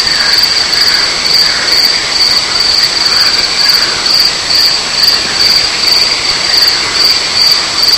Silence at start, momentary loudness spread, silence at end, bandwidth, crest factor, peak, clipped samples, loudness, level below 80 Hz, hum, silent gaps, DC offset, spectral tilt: 0 s; 1 LU; 0 s; over 20 kHz; 10 dB; 0 dBFS; 0.7%; -6 LUFS; -38 dBFS; none; none; under 0.1%; 0.5 dB/octave